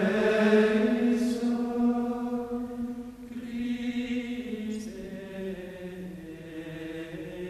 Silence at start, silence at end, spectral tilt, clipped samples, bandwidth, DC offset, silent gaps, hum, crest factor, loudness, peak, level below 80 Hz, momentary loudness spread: 0 s; 0 s; -6.5 dB/octave; under 0.1%; 13.5 kHz; under 0.1%; none; none; 18 dB; -29 LUFS; -10 dBFS; -58 dBFS; 17 LU